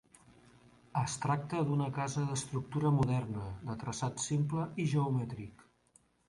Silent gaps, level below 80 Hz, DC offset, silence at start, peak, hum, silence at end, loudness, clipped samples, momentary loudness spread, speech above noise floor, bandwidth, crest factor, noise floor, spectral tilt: none; -60 dBFS; under 0.1%; 0.95 s; -18 dBFS; none; 0.8 s; -35 LUFS; under 0.1%; 10 LU; 35 dB; 11.5 kHz; 16 dB; -69 dBFS; -6 dB/octave